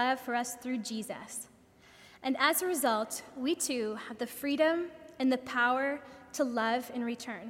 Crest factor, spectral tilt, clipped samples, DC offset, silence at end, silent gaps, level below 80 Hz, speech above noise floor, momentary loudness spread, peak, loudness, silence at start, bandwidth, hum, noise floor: 20 dB; -2.5 dB/octave; under 0.1%; under 0.1%; 0 s; none; -74 dBFS; 26 dB; 12 LU; -12 dBFS; -32 LUFS; 0 s; 16.5 kHz; none; -58 dBFS